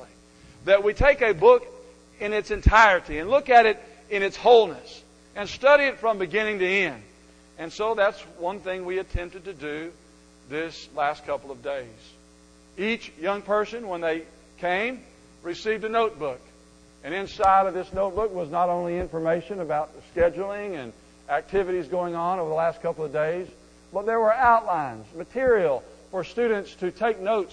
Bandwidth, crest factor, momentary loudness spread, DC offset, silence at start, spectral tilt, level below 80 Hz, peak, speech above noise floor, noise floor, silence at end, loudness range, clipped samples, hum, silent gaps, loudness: 10 kHz; 22 dB; 17 LU; under 0.1%; 0 s; -5.5 dB/octave; -42 dBFS; -4 dBFS; 30 dB; -53 dBFS; 0.05 s; 10 LU; under 0.1%; none; none; -24 LUFS